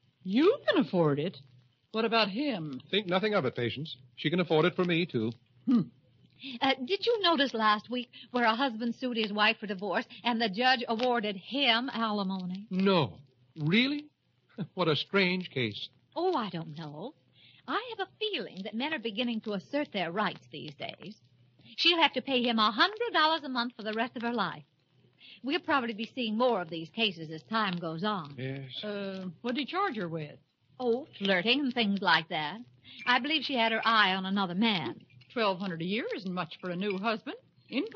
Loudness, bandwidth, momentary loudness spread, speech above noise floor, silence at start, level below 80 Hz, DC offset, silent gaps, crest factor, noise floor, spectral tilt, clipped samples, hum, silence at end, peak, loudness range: -30 LUFS; 6.8 kHz; 14 LU; 36 dB; 0.25 s; -80 dBFS; under 0.1%; none; 20 dB; -66 dBFS; -2.5 dB/octave; under 0.1%; none; 0 s; -10 dBFS; 6 LU